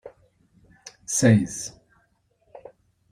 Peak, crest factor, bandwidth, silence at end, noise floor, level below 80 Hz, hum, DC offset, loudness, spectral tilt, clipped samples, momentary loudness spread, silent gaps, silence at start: -6 dBFS; 22 dB; 15.5 kHz; 1.4 s; -67 dBFS; -58 dBFS; none; under 0.1%; -22 LUFS; -5.5 dB/octave; under 0.1%; 27 LU; none; 0.05 s